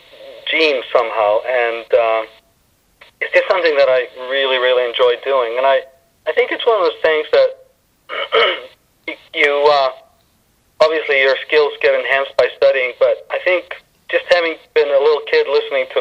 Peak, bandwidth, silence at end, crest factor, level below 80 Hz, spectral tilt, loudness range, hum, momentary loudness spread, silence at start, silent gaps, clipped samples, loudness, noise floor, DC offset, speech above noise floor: 0 dBFS; 8.2 kHz; 0 s; 16 dB; -62 dBFS; -3 dB/octave; 2 LU; none; 8 LU; 0.2 s; none; under 0.1%; -15 LUFS; -58 dBFS; under 0.1%; 43 dB